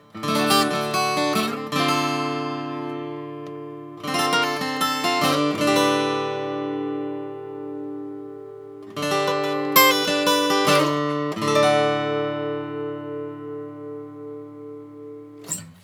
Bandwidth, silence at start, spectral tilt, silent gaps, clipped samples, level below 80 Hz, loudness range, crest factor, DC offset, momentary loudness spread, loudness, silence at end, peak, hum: over 20 kHz; 0.15 s; -3.5 dB/octave; none; under 0.1%; -78 dBFS; 9 LU; 22 dB; under 0.1%; 19 LU; -22 LUFS; 0.1 s; -2 dBFS; none